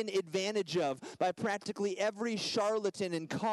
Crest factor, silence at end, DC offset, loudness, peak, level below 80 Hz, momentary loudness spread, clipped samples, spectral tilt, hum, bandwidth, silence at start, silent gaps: 14 dB; 0 s; under 0.1%; -34 LUFS; -20 dBFS; -78 dBFS; 4 LU; under 0.1%; -4 dB/octave; none; 12 kHz; 0 s; none